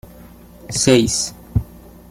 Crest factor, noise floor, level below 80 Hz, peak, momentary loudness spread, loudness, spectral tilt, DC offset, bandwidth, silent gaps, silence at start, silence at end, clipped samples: 18 dB; -42 dBFS; -36 dBFS; -2 dBFS; 11 LU; -18 LUFS; -4 dB/octave; under 0.1%; 16.5 kHz; none; 0.65 s; 0.35 s; under 0.1%